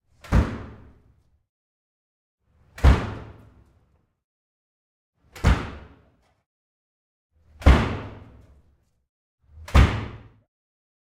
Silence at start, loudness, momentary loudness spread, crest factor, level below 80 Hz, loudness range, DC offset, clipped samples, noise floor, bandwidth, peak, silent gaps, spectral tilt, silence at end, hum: 0.3 s; -23 LUFS; 23 LU; 24 dB; -28 dBFS; 7 LU; under 0.1%; under 0.1%; -64 dBFS; 10.5 kHz; -2 dBFS; 1.49-2.38 s, 4.24-5.13 s, 6.46-7.30 s, 9.09-9.38 s; -7 dB/octave; 0.9 s; none